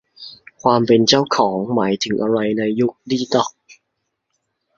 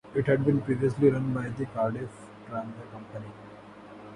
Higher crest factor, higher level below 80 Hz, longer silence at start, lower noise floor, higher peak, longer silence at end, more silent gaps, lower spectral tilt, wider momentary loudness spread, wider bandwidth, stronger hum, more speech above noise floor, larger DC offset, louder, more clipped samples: about the same, 18 dB vs 20 dB; about the same, -58 dBFS vs -58 dBFS; first, 0.2 s vs 0.05 s; first, -75 dBFS vs -47 dBFS; first, 0 dBFS vs -10 dBFS; first, 1.05 s vs 0 s; neither; second, -4.5 dB/octave vs -9 dB/octave; second, 11 LU vs 23 LU; second, 7.6 kHz vs 10.5 kHz; neither; first, 58 dB vs 19 dB; neither; first, -17 LUFS vs -28 LUFS; neither